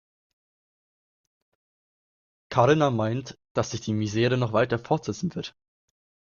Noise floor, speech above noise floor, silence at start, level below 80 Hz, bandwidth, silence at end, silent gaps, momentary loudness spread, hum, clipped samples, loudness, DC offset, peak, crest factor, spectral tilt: under -90 dBFS; over 65 dB; 2.5 s; -60 dBFS; 7.2 kHz; 0.8 s; 3.51-3.55 s; 11 LU; none; under 0.1%; -25 LUFS; under 0.1%; -6 dBFS; 22 dB; -6 dB/octave